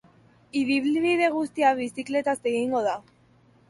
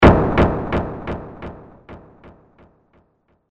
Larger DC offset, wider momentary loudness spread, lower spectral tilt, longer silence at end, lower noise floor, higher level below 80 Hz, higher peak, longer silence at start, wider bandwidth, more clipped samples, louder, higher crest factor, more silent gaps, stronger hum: neither; second, 7 LU vs 26 LU; second, -4.5 dB/octave vs -8.5 dB/octave; second, 0.7 s vs 1.55 s; second, -59 dBFS vs -63 dBFS; second, -70 dBFS vs -30 dBFS; second, -10 dBFS vs -2 dBFS; first, 0.55 s vs 0 s; first, 11.5 kHz vs 7.6 kHz; neither; second, -25 LUFS vs -19 LUFS; about the same, 16 dB vs 18 dB; neither; neither